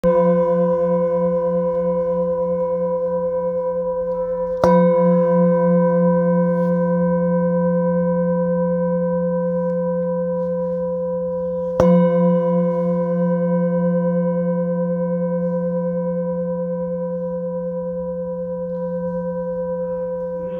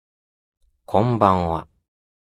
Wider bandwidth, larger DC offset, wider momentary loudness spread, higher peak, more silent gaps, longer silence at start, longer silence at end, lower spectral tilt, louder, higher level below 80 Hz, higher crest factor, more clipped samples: second, 6 kHz vs 12 kHz; neither; about the same, 9 LU vs 9 LU; about the same, 0 dBFS vs 0 dBFS; neither; second, 0.05 s vs 0.9 s; second, 0 s vs 0.75 s; first, -10.5 dB/octave vs -8.5 dB/octave; about the same, -20 LUFS vs -20 LUFS; about the same, -48 dBFS vs -48 dBFS; second, 18 dB vs 24 dB; neither